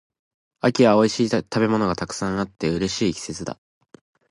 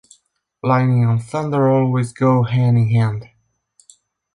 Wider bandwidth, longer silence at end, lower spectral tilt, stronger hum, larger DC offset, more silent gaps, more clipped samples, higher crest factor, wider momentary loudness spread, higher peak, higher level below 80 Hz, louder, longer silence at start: about the same, 11.5 kHz vs 11 kHz; second, 0.8 s vs 1.1 s; second, -5.5 dB/octave vs -8.5 dB/octave; neither; neither; neither; neither; first, 20 dB vs 14 dB; first, 14 LU vs 6 LU; about the same, -4 dBFS vs -4 dBFS; about the same, -50 dBFS vs -54 dBFS; second, -22 LUFS vs -17 LUFS; about the same, 0.65 s vs 0.65 s